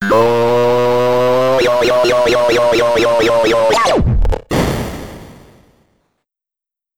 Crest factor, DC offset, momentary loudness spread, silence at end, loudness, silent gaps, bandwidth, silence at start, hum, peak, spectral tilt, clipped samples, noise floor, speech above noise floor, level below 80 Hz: 12 dB; 1%; 6 LU; 0 s; -13 LUFS; none; 17.5 kHz; 0 s; none; -2 dBFS; -5 dB/octave; under 0.1%; -87 dBFS; 76 dB; -26 dBFS